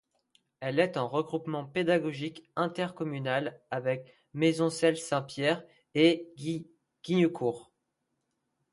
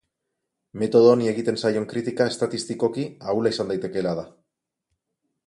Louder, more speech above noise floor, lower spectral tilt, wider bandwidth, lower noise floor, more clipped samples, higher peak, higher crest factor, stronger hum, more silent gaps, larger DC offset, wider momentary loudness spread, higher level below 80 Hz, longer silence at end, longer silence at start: second, -30 LUFS vs -23 LUFS; second, 51 dB vs 59 dB; about the same, -5.5 dB/octave vs -5.5 dB/octave; about the same, 11.5 kHz vs 11.5 kHz; about the same, -81 dBFS vs -81 dBFS; neither; second, -12 dBFS vs -4 dBFS; about the same, 20 dB vs 20 dB; neither; neither; neither; about the same, 11 LU vs 12 LU; second, -74 dBFS vs -64 dBFS; about the same, 1.1 s vs 1.15 s; second, 0.6 s vs 0.75 s